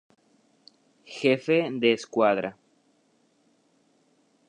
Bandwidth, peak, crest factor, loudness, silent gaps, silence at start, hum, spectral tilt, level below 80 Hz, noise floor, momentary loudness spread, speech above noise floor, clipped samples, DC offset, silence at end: 10 kHz; -8 dBFS; 22 dB; -25 LUFS; none; 1.1 s; none; -5.5 dB/octave; -78 dBFS; -67 dBFS; 10 LU; 42 dB; under 0.1%; under 0.1%; 2 s